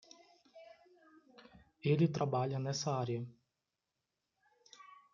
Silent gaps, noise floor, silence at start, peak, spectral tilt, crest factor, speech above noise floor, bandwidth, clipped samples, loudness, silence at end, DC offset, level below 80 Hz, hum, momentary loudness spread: none; -89 dBFS; 0.55 s; -20 dBFS; -6.5 dB/octave; 20 dB; 54 dB; 7.4 kHz; under 0.1%; -36 LUFS; 0.2 s; under 0.1%; -78 dBFS; none; 26 LU